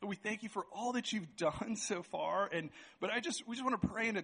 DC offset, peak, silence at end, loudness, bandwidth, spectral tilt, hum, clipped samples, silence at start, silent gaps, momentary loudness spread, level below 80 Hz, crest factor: under 0.1%; -20 dBFS; 0 s; -38 LUFS; 10 kHz; -4 dB/octave; none; under 0.1%; 0 s; none; 6 LU; -68 dBFS; 18 dB